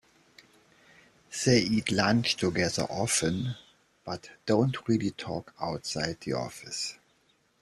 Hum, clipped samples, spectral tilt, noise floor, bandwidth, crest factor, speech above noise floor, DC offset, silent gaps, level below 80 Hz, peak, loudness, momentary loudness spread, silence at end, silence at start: none; under 0.1%; -4.5 dB/octave; -68 dBFS; 13.5 kHz; 20 dB; 40 dB; under 0.1%; none; -60 dBFS; -10 dBFS; -29 LUFS; 13 LU; 0.65 s; 1.3 s